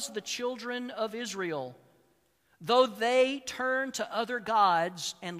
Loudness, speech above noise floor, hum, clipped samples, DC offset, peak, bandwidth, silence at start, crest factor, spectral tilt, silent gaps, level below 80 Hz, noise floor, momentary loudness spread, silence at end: -29 LUFS; 40 dB; none; under 0.1%; under 0.1%; -10 dBFS; 15.5 kHz; 0 s; 22 dB; -3 dB/octave; none; -76 dBFS; -70 dBFS; 11 LU; 0 s